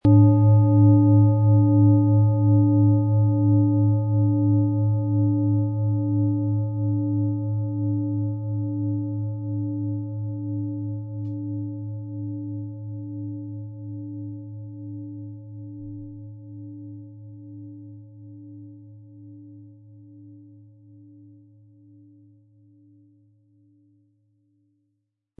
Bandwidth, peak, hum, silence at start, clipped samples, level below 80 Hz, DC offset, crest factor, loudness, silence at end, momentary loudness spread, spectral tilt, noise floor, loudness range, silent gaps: 1.3 kHz; -6 dBFS; none; 0.05 s; under 0.1%; -60 dBFS; under 0.1%; 16 dB; -22 LUFS; 5.05 s; 23 LU; -15 dB/octave; -77 dBFS; 23 LU; none